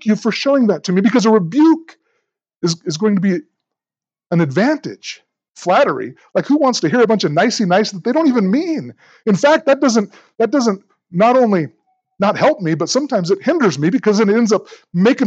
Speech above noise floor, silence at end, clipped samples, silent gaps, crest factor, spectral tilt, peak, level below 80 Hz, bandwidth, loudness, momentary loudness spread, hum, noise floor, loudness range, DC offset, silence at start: over 75 dB; 0 s; under 0.1%; 2.57-2.61 s; 14 dB; -5.5 dB/octave; -2 dBFS; -74 dBFS; 8.2 kHz; -15 LUFS; 11 LU; none; under -90 dBFS; 4 LU; under 0.1%; 0 s